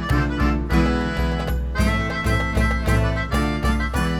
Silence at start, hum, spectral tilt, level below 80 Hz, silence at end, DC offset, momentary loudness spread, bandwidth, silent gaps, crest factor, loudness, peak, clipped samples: 0 s; none; -6 dB/octave; -24 dBFS; 0 s; under 0.1%; 3 LU; 15 kHz; none; 14 dB; -21 LUFS; -6 dBFS; under 0.1%